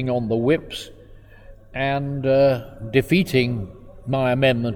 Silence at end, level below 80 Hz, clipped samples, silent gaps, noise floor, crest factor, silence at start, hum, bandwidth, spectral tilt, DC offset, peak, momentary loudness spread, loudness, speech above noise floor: 0 s; -44 dBFS; under 0.1%; none; -44 dBFS; 18 dB; 0 s; none; 18 kHz; -7 dB/octave; under 0.1%; -4 dBFS; 16 LU; -21 LUFS; 24 dB